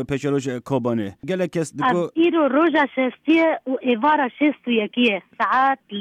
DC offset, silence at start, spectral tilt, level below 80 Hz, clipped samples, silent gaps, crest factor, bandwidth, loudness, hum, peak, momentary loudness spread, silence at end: under 0.1%; 0 s; -6 dB/octave; -60 dBFS; under 0.1%; none; 12 dB; 10.5 kHz; -20 LUFS; none; -8 dBFS; 7 LU; 0 s